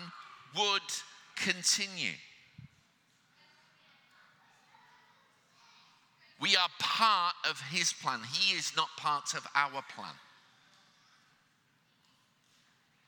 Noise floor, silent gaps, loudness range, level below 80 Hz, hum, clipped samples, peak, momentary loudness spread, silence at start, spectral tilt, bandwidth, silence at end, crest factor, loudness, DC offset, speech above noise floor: -71 dBFS; none; 10 LU; -86 dBFS; none; under 0.1%; -8 dBFS; 18 LU; 0 s; -0.5 dB/octave; 19 kHz; 2.85 s; 28 dB; -31 LUFS; under 0.1%; 39 dB